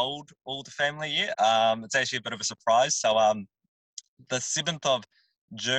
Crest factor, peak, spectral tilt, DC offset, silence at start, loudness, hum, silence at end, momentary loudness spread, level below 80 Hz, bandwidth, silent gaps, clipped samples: 16 dB; -12 dBFS; -2 dB/octave; under 0.1%; 0 s; -26 LUFS; none; 0 s; 17 LU; -72 dBFS; 10 kHz; 3.68-3.97 s, 4.08-4.17 s, 5.38-5.48 s; under 0.1%